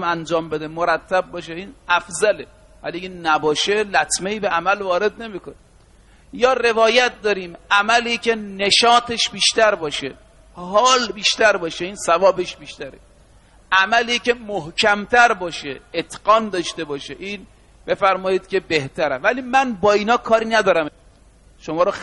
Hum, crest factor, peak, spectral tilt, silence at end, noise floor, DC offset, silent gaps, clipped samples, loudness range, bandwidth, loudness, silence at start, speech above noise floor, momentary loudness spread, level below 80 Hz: none; 18 dB; -2 dBFS; -2.5 dB/octave; 0 s; -50 dBFS; under 0.1%; none; under 0.1%; 5 LU; 11.5 kHz; -18 LUFS; 0 s; 31 dB; 15 LU; -50 dBFS